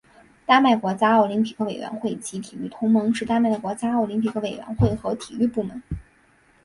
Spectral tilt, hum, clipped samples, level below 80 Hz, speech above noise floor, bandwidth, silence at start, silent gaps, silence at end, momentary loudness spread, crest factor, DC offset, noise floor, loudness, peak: -6 dB/octave; none; under 0.1%; -46 dBFS; 36 dB; 11.5 kHz; 0.5 s; none; 0.65 s; 14 LU; 20 dB; under 0.1%; -58 dBFS; -22 LUFS; -2 dBFS